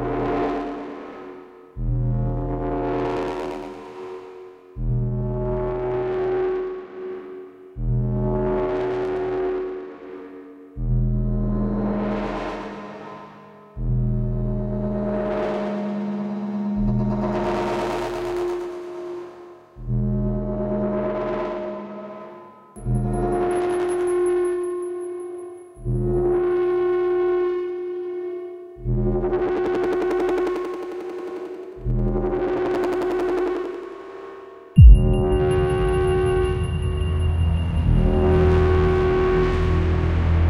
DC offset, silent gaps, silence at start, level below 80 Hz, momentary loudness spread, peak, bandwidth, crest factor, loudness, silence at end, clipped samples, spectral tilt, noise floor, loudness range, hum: under 0.1%; none; 0 s; -28 dBFS; 16 LU; 0 dBFS; 11 kHz; 22 dB; -23 LUFS; 0 s; under 0.1%; -8.5 dB/octave; -44 dBFS; 8 LU; none